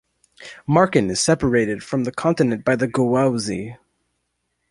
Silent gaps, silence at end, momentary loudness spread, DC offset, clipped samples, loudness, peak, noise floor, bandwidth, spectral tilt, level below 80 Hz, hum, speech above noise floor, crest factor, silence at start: none; 0.95 s; 12 LU; under 0.1%; under 0.1%; -20 LUFS; -2 dBFS; -73 dBFS; 11.5 kHz; -5.5 dB/octave; -48 dBFS; none; 54 dB; 20 dB; 0.4 s